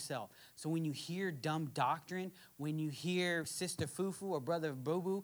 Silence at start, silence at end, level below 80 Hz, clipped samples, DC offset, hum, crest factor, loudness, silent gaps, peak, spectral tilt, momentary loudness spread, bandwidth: 0 s; 0 s; -78 dBFS; under 0.1%; under 0.1%; none; 18 dB; -39 LUFS; none; -22 dBFS; -5 dB/octave; 8 LU; over 20 kHz